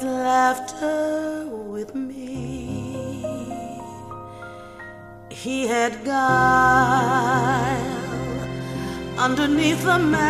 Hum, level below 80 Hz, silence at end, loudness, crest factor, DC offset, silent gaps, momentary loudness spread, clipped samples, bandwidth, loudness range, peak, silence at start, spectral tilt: none; -46 dBFS; 0 s; -22 LUFS; 18 dB; under 0.1%; none; 20 LU; under 0.1%; 15.5 kHz; 12 LU; -4 dBFS; 0 s; -5 dB/octave